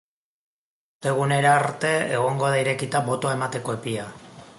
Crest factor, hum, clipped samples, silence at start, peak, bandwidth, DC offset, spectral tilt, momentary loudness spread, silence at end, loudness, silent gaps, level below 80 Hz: 18 dB; none; under 0.1%; 1 s; -6 dBFS; 11.5 kHz; under 0.1%; -5 dB/octave; 11 LU; 0.05 s; -23 LUFS; none; -64 dBFS